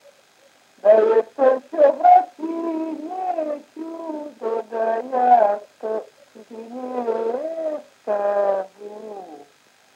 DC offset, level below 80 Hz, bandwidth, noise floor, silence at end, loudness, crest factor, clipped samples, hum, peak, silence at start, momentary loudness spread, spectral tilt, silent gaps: under 0.1%; under -90 dBFS; 8.8 kHz; -56 dBFS; 0.55 s; -20 LUFS; 18 dB; under 0.1%; none; -2 dBFS; 0.85 s; 19 LU; -5.5 dB/octave; none